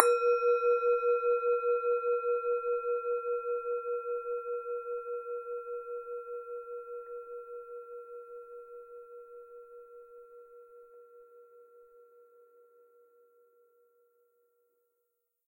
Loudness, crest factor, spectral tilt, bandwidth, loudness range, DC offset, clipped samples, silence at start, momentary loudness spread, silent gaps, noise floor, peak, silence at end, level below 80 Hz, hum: -32 LUFS; 32 dB; 0 dB/octave; 11 kHz; 24 LU; under 0.1%; under 0.1%; 0 s; 24 LU; none; -82 dBFS; -2 dBFS; 3.45 s; -82 dBFS; none